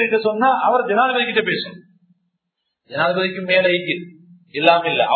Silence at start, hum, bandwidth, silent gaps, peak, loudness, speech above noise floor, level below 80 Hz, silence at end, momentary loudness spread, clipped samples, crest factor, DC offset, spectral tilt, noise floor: 0 s; none; 4.6 kHz; none; 0 dBFS; -17 LUFS; 58 dB; -70 dBFS; 0 s; 10 LU; under 0.1%; 18 dB; under 0.1%; -7.5 dB/octave; -76 dBFS